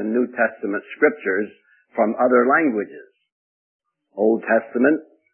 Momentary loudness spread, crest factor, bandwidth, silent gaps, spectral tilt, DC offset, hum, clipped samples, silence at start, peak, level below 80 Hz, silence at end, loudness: 11 LU; 18 dB; 3.3 kHz; 3.32-3.80 s; -11 dB/octave; under 0.1%; none; under 0.1%; 0 s; -2 dBFS; -78 dBFS; 0.3 s; -20 LUFS